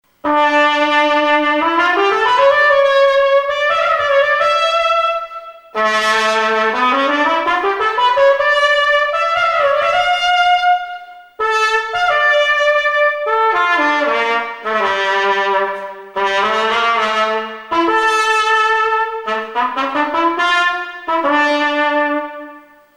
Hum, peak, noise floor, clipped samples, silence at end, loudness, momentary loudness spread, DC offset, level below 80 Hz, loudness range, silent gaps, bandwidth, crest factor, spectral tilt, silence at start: none; 0 dBFS; -39 dBFS; under 0.1%; 0.35 s; -14 LUFS; 7 LU; under 0.1%; -54 dBFS; 3 LU; none; 12 kHz; 14 dB; -2 dB/octave; 0.25 s